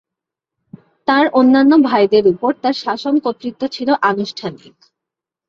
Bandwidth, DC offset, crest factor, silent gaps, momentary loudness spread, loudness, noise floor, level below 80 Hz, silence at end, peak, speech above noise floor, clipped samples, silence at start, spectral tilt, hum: 7.2 kHz; under 0.1%; 14 dB; none; 13 LU; -15 LUFS; -84 dBFS; -60 dBFS; 0.95 s; -2 dBFS; 70 dB; under 0.1%; 1.1 s; -6 dB/octave; none